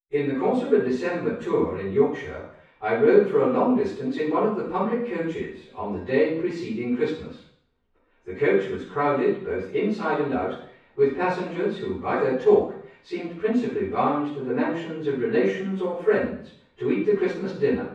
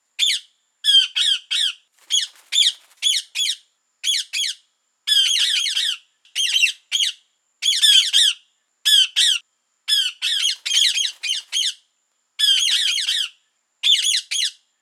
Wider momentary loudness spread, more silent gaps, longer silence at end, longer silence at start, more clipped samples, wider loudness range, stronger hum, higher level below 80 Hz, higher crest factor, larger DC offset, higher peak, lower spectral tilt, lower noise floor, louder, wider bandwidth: about the same, 12 LU vs 10 LU; neither; second, 0 s vs 0.3 s; about the same, 0.1 s vs 0.2 s; neither; about the same, 4 LU vs 4 LU; neither; first, -58 dBFS vs under -90 dBFS; about the same, 20 dB vs 20 dB; neither; about the same, -4 dBFS vs -2 dBFS; first, -8 dB/octave vs 10.5 dB/octave; about the same, -67 dBFS vs -70 dBFS; second, -24 LUFS vs -17 LUFS; second, 8 kHz vs 18 kHz